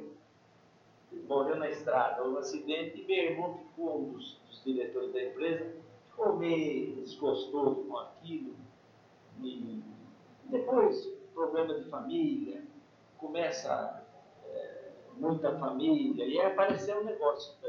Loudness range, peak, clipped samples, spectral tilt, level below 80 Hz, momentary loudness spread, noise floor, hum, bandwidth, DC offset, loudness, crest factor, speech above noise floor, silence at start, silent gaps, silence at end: 5 LU; -14 dBFS; under 0.1%; -5.5 dB/octave; -82 dBFS; 17 LU; -63 dBFS; none; 7.2 kHz; under 0.1%; -34 LUFS; 20 dB; 30 dB; 0 s; none; 0 s